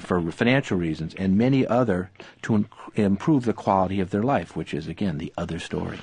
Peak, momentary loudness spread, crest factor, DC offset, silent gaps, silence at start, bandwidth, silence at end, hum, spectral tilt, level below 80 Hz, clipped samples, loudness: -6 dBFS; 10 LU; 18 dB; under 0.1%; none; 0 s; 10 kHz; 0 s; none; -7.5 dB/octave; -46 dBFS; under 0.1%; -24 LUFS